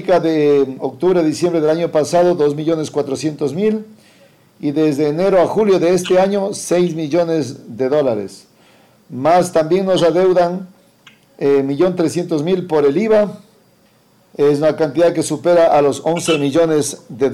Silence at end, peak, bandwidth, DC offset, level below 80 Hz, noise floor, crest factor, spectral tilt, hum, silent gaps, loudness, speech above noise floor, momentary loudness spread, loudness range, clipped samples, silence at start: 0 s; -2 dBFS; 14.5 kHz; under 0.1%; -54 dBFS; -53 dBFS; 14 dB; -5.5 dB/octave; none; none; -15 LUFS; 38 dB; 8 LU; 2 LU; under 0.1%; 0 s